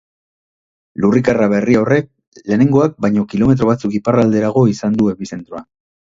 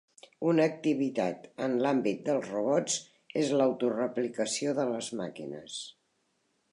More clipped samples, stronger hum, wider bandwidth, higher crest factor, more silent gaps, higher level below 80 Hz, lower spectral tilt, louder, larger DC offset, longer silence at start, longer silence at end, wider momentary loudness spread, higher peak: neither; neither; second, 7.6 kHz vs 11 kHz; about the same, 16 dB vs 16 dB; first, 2.27-2.32 s vs none; first, -46 dBFS vs -80 dBFS; first, -8 dB/octave vs -4.5 dB/octave; first, -14 LUFS vs -30 LUFS; neither; first, 1 s vs 0.4 s; second, 0.5 s vs 0.8 s; first, 16 LU vs 12 LU; first, 0 dBFS vs -14 dBFS